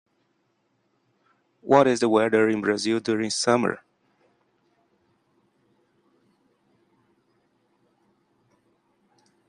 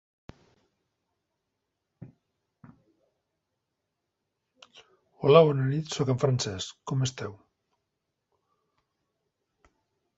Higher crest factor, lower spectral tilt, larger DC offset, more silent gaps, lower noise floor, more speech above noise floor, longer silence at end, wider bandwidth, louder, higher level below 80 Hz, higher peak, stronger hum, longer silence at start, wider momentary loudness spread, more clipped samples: about the same, 24 dB vs 26 dB; second, -4.5 dB/octave vs -6 dB/octave; neither; neither; second, -71 dBFS vs -83 dBFS; second, 50 dB vs 58 dB; first, 5.7 s vs 2.85 s; first, 11 kHz vs 8 kHz; first, -22 LUFS vs -25 LUFS; second, -72 dBFS vs -64 dBFS; about the same, -4 dBFS vs -4 dBFS; neither; second, 1.65 s vs 2 s; second, 9 LU vs 16 LU; neither